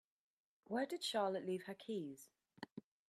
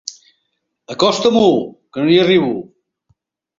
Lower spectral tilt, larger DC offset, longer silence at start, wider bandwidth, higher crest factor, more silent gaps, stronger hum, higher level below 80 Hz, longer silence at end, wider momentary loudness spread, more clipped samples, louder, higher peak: about the same, -4.5 dB/octave vs -5 dB/octave; neither; first, 0.7 s vs 0.05 s; first, 14.5 kHz vs 7.6 kHz; about the same, 18 dB vs 16 dB; first, 2.72-2.76 s vs none; neither; second, under -90 dBFS vs -56 dBFS; second, 0.3 s vs 1 s; about the same, 16 LU vs 16 LU; neither; second, -43 LUFS vs -14 LUFS; second, -26 dBFS vs 0 dBFS